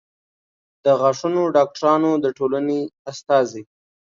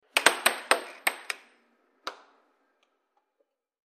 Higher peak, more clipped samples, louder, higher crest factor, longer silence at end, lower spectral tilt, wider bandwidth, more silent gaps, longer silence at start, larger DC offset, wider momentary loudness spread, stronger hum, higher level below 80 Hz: about the same, -4 dBFS vs -2 dBFS; neither; first, -19 LUFS vs -26 LUFS; second, 16 dB vs 30 dB; second, 0.4 s vs 1.7 s; first, -6 dB/octave vs 1 dB/octave; second, 7.6 kHz vs 15.5 kHz; first, 2.99-3.05 s vs none; first, 0.85 s vs 0.15 s; neither; second, 9 LU vs 19 LU; neither; first, -70 dBFS vs -80 dBFS